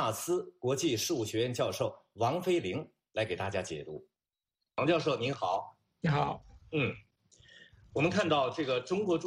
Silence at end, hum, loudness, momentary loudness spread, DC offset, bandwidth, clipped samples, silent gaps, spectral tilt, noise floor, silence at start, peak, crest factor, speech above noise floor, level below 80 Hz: 0 s; none; -33 LUFS; 11 LU; under 0.1%; 15 kHz; under 0.1%; none; -5 dB/octave; under -90 dBFS; 0 s; -16 dBFS; 18 dB; over 58 dB; -64 dBFS